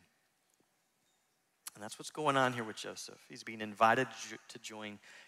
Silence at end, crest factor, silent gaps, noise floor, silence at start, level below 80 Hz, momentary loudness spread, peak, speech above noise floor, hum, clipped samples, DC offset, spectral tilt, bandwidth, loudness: 0.05 s; 24 dB; none; -78 dBFS; 1.65 s; -82 dBFS; 19 LU; -14 dBFS; 41 dB; none; under 0.1%; under 0.1%; -3.5 dB/octave; 16 kHz; -35 LUFS